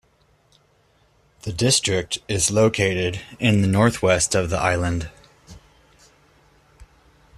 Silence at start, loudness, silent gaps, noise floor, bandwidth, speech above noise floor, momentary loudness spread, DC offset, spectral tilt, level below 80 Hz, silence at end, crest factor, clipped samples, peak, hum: 1.45 s; -20 LUFS; none; -60 dBFS; 13.5 kHz; 40 dB; 9 LU; under 0.1%; -4 dB/octave; -46 dBFS; 0.55 s; 20 dB; under 0.1%; -2 dBFS; none